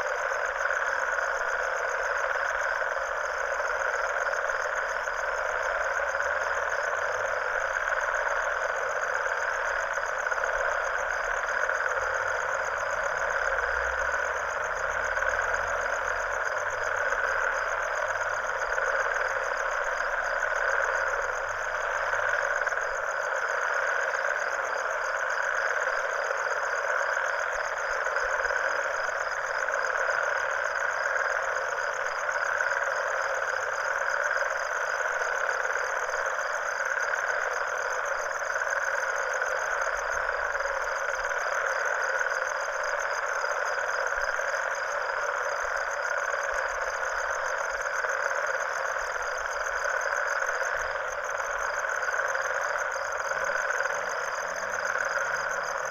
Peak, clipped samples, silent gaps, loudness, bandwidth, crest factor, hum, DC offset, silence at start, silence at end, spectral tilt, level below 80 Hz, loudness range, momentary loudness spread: -12 dBFS; under 0.1%; none; -28 LUFS; 19.5 kHz; 16 dB; none; under 0.1%; 0 s; 0 s; -0.5 dB/octave; -54 dBFS; 1 LU; 3 LU